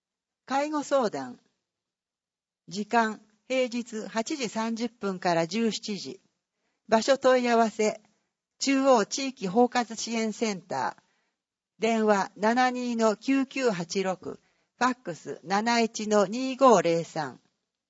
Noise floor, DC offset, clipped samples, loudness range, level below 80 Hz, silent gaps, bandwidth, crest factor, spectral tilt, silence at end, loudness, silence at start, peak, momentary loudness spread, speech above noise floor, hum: under -90 dBFS; under 0.1%; under 0.1%; 5 LU; -78 dBFS; none; 8 kHz; 22 dB; -4 dB/octave; 0.55 s; -27 LUFS; 0.5 s; -6 dBFS; 13 LU; over 64 dB; none